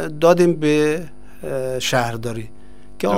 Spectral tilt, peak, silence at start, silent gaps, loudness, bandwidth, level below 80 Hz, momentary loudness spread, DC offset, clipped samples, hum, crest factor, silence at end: -5.5 dB/octave; -2 dBFS; 0 s; none; -19 LUFS; 16 kHz; -48 dBFS; 19 LU; 3%; under 0.1%; 50 Hz at -45 dBFS; 18 dB; 0 s